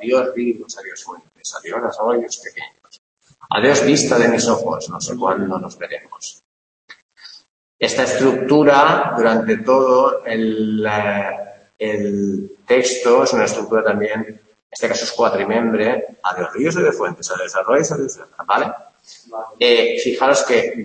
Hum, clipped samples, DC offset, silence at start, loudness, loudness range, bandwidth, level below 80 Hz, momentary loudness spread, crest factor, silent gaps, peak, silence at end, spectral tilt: none; under 0.1%; under 0.1%; 0 s; -17 LUFS; 7 LU; 8.8 kHz; -62 dBFS; 17 LU; 16 dB; 2.99-3.17 s, 6.45-6.88 s, 7.02-7.09 s, 7.49-7.79 s, 14.62-14.70 s; -2 dBFS; 0 s; -4 dB/octave